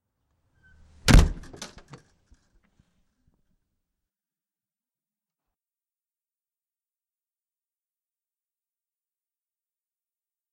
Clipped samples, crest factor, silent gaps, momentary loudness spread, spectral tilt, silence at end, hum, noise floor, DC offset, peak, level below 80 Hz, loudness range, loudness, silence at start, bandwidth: under 0.1%; 24 dB; none; 23 LU; -5 dB/octave; 8.85 s; none; under -90 dBFS; under 0.1%; -6 dBFS; -32 dBFS; 7 LU; -21 LUFS; 1.05 s; 15.5 kHz